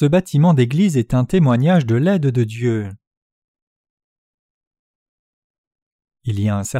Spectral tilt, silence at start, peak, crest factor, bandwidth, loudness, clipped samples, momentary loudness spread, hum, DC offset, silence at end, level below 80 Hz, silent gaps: -7.5 dB/octave; 0 s; -4 dBFS; 14 dB; 14 kHz; -17 LUFS; under 0.1%; 9 LU; none; under 0.1%; 0 s; -46 dBFS; 3.07-3.11 s, 3.17-3.55 s, 3.62-3.84 s, 3.90-3.97 s, 4.04-4.61 s, 4.67-4.71 s, 4.79-5.71 s, 5.82-5.99 s